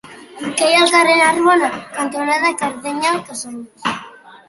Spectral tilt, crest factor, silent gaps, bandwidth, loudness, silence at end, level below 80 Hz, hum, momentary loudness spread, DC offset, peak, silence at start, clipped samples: -2 dB/octave; 16 dB; none; 12 kHz; -15 LUFS; 0.15 s; -62 dBFS; none; 17 LU; under 0.1%; -2 dBFS; 0.05 s; under 0.1%